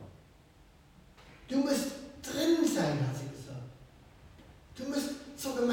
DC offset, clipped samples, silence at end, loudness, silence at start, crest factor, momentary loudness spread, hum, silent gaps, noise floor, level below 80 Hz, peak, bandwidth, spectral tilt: under 0.1%; under 0.1%; 0 s; -33 LUFS; 0 s; 18 dB; 20 LU; none; none; -59 dBFS; -62 dBFS; -18 dBFS; 17 kHz; -5 dB/octave